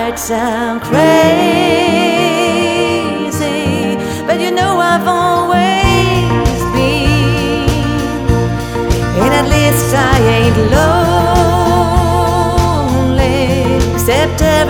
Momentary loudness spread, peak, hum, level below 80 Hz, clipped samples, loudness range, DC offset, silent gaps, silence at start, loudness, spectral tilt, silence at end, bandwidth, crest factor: 6 LU; 0 dBFS; none; -22 dBFS; under 0.1%; 3 LU; under 0.1%; none; 0 s; -12 LUFS; -5.5 dB/octave; 0 s; 19.5 kHz; 12 dB